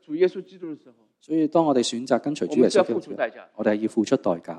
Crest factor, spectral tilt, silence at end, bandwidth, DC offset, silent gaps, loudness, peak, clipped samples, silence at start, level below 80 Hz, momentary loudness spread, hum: 18 dB; -5 dB/octave; 0 s; 10.5 kHz; under 0.1%; none; -23 LUFS; -4 dBFS; under 0.1%; 0.1 s; -72 dBFS; 17 LU; none